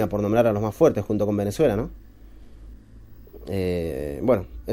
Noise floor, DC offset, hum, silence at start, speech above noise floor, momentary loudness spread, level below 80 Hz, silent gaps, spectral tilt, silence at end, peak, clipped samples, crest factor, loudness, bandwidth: -45 dBFS; under 0.1%; none; 0 s; 22 dB; 9 LU; -44 dBFS; none; -7.5 dB/octave; 0 s; -6 dBFS; under 0.1%; 18 dB; -23 LUFS; 16 kHz